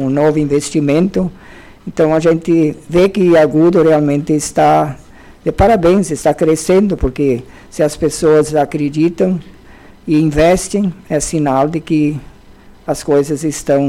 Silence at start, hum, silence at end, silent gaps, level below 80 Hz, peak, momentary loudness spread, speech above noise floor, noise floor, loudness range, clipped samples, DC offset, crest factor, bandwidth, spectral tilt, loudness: 0 s; none; 0 s; none; -34 dBFS; -4 dBFS; 11 LU; 27 dB; -40 dBFS; 3 LU; under 0.1%; under 0.1%; 10 dB; 15.5 kHz; -6 dB/octave; -13 LUFS